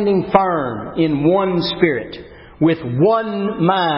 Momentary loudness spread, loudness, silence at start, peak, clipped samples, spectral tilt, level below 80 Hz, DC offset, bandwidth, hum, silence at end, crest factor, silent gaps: 8 LU; -17 LUFS; 0 s; 0 dBFS; under 0.1%; -10 dB/octave; -48 dBFS; under 0.1%; 5.8 kHz; none; 0 s; 16 dB; none